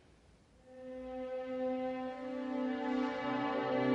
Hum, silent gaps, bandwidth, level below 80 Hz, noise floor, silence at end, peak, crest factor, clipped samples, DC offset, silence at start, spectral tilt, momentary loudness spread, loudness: none; none; 7.6 kHz; -68 dBFS; -64 dBFS; 0 s; -20 dBFS; 16 dB; under 0.1%; under 0.1%; 0.65 s; -7 dB/octave; 12 LU; -38 LUFS